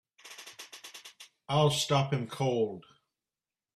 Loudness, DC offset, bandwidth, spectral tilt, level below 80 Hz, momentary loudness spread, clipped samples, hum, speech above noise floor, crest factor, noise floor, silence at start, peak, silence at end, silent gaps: -29 LUFS; under 0.1%; 14 kHz; -5 dB/octave; -68 dBFS; 22 LU; under 0.1%; none; over 61 dB; 20 dB; under -90 dBFS; 0.25 s; -12 dBFS; 0.95 s; none